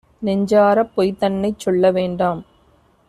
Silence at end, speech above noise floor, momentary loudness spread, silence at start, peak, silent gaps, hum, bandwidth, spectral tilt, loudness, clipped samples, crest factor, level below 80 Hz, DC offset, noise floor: 0.65 s; 39 dB; 8 LU; 0.2 s; -4 dBFS; none; none; 13.5 kHz; -7 dB/octave; -18 LUFS; under 0.1%; 16 dB; -52 dBFS; under 0.1%; -55 dBFS